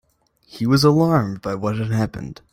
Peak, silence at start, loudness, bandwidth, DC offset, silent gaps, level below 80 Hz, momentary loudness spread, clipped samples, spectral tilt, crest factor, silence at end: -2 dBFS; 0.55 s; -19 LUFS; 16 kHz; under 0.1%; none; -48 dBFS; 11 LU; under 0.1%; -7 dB/octave; 18 dB; 0.2 s